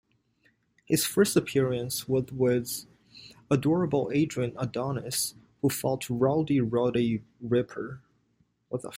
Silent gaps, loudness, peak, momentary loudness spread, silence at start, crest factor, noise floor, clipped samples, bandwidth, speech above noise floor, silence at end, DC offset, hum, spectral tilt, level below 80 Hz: none; -28 LUFS; -10 dBFS; 11 LU; 0.9 s; 20 dB; -70 dBFS; under 0.1%; 16.5 kHz; 43 dB; 0 s; under 0.1%; none; -5.5 dB/octave; -62 dBFS